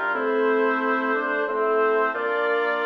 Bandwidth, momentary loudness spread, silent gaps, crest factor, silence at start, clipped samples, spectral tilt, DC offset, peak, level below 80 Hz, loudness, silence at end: 5.6 kHz; 3 LU; none; 12 dB; 0 s; under 0.1%; -5 dB/octave; under 0.1%; -10 dBFS; -72 dBFS; -22 LUFS; 0 s